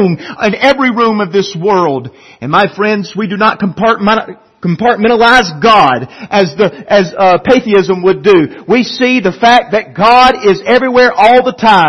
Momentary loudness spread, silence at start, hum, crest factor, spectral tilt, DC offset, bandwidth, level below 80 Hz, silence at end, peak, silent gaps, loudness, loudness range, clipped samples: 8 LU; 0 s; none; 10 dB; -5.5 dB/octave; under 0.1%; 12 kHz; -42 dBFS; 0 s; 0 dBFS; none; -9 LUFS; 4 LU; 0.5%